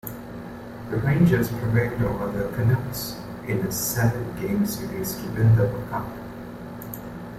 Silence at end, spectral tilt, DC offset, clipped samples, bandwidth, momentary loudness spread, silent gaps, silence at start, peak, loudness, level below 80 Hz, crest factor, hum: 0 s; -6.5 dB/octave; under 0.1%; under 0.1%; 16 kHz; 17 LU; none; 0.05 s; -6 dBFS; -24 LUFS; -44 dBFS; 18 dB; none